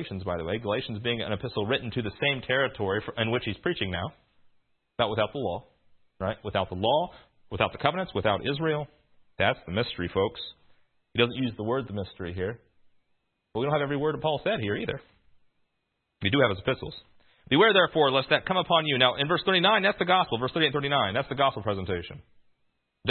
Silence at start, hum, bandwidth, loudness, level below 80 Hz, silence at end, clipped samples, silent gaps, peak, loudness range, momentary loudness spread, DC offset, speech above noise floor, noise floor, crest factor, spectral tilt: 0 s; none; 4.5 kHz; -27 LUFS; -58 dBFS; 0 s; under 0.1%; none; -4 dBFS; 8 LU; 12 LU; under 0.1%; 52 dB; -78 dBFS; 24 dB; -9.5 dB/octave